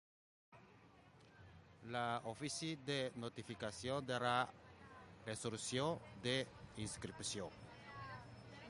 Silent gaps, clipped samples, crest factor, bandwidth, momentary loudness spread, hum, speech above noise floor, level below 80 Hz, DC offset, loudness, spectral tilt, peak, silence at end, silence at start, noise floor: none; under 0.1%; 22 dB; 11.5 kHz; 19 LU; none; 22 dB; -70 dBFS; under 0.1%; -44 LUFS; -4 dB/octave; -24 dBFS; 0 s; 0.5 s; -66 dBFS